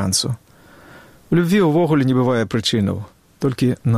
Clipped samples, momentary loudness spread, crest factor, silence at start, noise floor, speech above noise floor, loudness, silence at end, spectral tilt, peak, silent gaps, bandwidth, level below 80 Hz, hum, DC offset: under 0.1%; 11 LU; 14 dB; 0 s; -46 dBFS; 29 dB; -18 LUFS; 0 s; -5.5 dB/octave; -6 dBFS; none; 15.5 kHz; -52 dBFS; none; under 0.1%